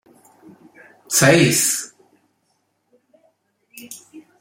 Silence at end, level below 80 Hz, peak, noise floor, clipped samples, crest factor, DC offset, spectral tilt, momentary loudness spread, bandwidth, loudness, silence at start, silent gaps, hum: 0.2 s; -60 dBFS; 0 dBFS; -68 dBFS; under 0.1%; 22 dB; under 0.1%; -3.5 dB/octave; 25 LU; 16.5 kHz; -15 LUFS; 1.1 s; none; none